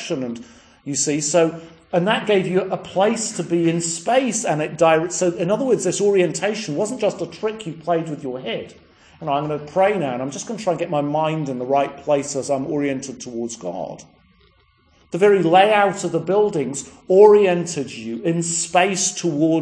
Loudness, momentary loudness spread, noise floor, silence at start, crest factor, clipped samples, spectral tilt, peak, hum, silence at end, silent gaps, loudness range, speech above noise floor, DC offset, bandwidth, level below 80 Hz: -20 LUFS; 13 LU; -57 dBFS; 0 s; 20 dB; under 0.1%; -4.5 dB/octave; 0 dBFS; none; 0 s; none; 7 LU; 38 dB; under 0.1%; 10.5 kHz; -62 dBFS